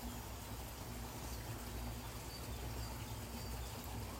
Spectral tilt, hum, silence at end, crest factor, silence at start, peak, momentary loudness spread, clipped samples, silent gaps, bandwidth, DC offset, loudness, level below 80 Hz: -4.5 dB/octave; none; 0 s; 12 dB; 0 s; -34 dBFS; 2 LU; under 0.1%; none; 16 kHz; under 0.1%; -47 LUFS; -50 dBFS